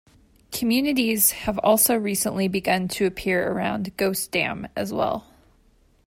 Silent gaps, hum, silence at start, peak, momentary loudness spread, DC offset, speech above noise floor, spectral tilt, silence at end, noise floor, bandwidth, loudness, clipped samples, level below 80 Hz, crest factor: none; none; 0.5 s; -6 dBFS; 9 LU; under 0.1%; 36 dB; -3.5 dB/octave; 0.85 s; -59 dBFS; 16.5 kHz; -22 LUFS; under 0.1%; -52 dBFS; 18 dB